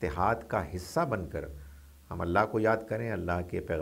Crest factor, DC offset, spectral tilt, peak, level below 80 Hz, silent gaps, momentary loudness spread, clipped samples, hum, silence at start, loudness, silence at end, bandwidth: 20 dB; under 0.1%; -7 dB/octave; -10 dBFS; -48 dBFS; none; 12 LU; under 0.1%; none; 0 s; -31 LUFS; 0 s; 16 kHz